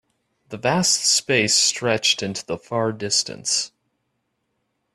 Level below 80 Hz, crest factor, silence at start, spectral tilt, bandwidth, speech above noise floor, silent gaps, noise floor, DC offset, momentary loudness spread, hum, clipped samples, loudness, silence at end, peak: -62 dBFS; 20 dB; 0.5 s; -2 dB/octave; 14 kHz; 52 dB; none; -74 dBFS; under 0.1%; 11 LU; none; under 0.1%; -19 LUFS; 1.3 s; -4 dBFS